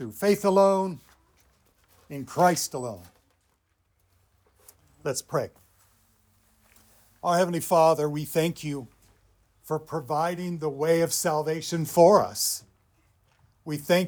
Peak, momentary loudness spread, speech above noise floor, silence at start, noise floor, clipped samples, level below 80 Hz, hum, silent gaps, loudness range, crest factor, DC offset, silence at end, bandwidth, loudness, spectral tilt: -4 dBFS; 16 LU; 46 dB; 0 s; -71 dBFS; under 0.1%; -66 dBFS; none; none; 13 LU; 22 dB; under 0.1%; 0 s; over 20 kHz; -25 LUFS; -4.5 dB/octave